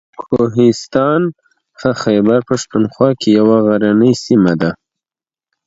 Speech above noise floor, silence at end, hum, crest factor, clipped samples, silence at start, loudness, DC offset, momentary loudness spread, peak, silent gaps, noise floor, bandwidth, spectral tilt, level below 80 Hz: over 78 dB; 0.95 s; none; 14 dB; under 0.1%; 0.2 s; -13 LUFS; under 0.1%; 8 LU; 0 dBFS; none; under -90 dBFS; 8 kHz; -6.5 dB/octave; -50 dBFS